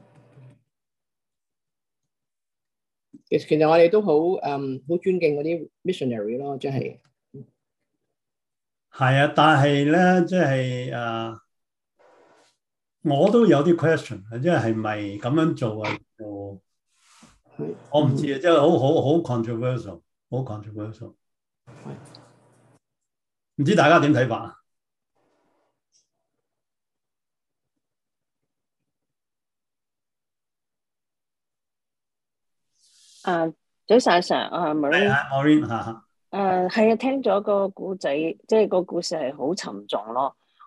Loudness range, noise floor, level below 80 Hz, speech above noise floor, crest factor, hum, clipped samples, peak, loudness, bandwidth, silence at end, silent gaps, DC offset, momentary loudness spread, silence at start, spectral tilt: 11 LU; under -90 dBFS; -68 dBFS; over 69 dB; 20 dB; none; under 0.1%; -4 dBFS; -22 LUFS; 11.5 kHz; 0.35 s; none; under 0.1%; 17 LU; 3.15 s; -6.5 dB/octave